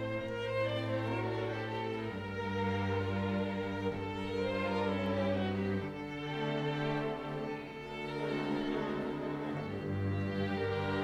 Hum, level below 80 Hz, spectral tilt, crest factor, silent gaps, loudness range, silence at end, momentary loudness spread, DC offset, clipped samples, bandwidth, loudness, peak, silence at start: none; -62 dBFS; -7.5 dB/octave; 14 dB; none; 2 LU; 0 s; 5 LU; under 0.1%; under 0.1%; 11 kHz; -36 LUFS; -22 dBFS; 0 s